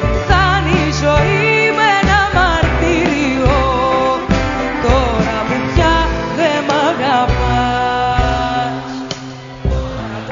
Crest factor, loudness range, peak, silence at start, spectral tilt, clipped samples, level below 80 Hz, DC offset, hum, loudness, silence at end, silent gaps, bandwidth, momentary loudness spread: 14 dB; 4 LU; 0 dBFS; 0 s; -4 dB/octave; under 0.1%; -22 dBFS; under 0.1%; none; -14 LUFS; 0 s; none; 7.6 kHz; 9 LU